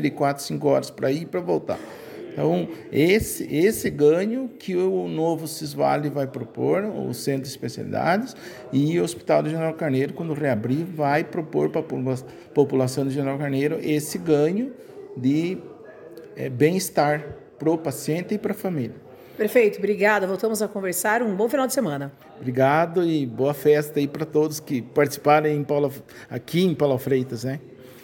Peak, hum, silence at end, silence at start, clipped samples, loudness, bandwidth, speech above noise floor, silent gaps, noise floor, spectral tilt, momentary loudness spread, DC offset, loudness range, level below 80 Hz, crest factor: -4 dBFS; none; 0.05 s; 0 s; under 0.1%; -23 LUFS; 17 kHz; 19 dB; none; -42 dBFS; -6 dB/octave; 12 LU; under 0.1%; 3 LU; -58 dBFS; 20 dB